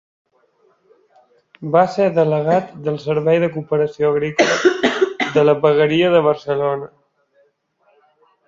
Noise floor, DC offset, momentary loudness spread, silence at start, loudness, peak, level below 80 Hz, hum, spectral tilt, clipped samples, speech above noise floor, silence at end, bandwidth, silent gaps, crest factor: -61 dBFS; under 0.1%; 7 LU; 1.6 s; -17 LUFS; -2 dBFS; -60 dBFS; none; -5.5 dB/octave; under 0.1%; 45 dB; 1.6 s; 7.6 kHz; none; 16 dB